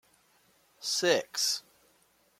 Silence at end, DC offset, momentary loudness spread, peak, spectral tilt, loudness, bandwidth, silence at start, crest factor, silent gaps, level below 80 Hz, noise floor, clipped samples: 0.8 s; under 0.1%; 9 LU; -10 dBFS; -1 dB/octave; -29 LUFS; 16.5 kHz; 0.8 s; 24 dB; none; -82 dBFS; -68 dBFS; under 0.1%